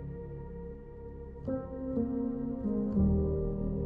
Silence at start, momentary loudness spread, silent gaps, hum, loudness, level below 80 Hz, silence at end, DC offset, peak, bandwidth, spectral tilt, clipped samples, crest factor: 0 s; 17 LU; none; none; -34 LUFS; -42 dBFS; 0 s; under 0.1%; -18 dBFS; 2.3 kHz; -13.5 dB/octave; under 0.1%; 16 dB